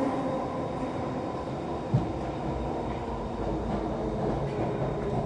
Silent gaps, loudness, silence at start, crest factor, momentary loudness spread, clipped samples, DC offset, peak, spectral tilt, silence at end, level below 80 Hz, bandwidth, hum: none; -31 LUFS; 0 s; 18 dB; 4 LU; under 0.1%; under 0.1%; -12 dBFS; -8 dB/octave; 0 s; -42 dBFS; 10.5 kHz; none